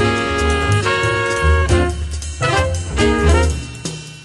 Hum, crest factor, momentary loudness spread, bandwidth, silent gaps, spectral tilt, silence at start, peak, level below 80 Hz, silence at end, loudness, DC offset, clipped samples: none; 14 dB; 11 LU; 11 kHz; none; -5 dB/octave; 0 s; -2 dBFS; -22 dBFS; 0 s; -17 LUFS; under 0.1%; under 0.1%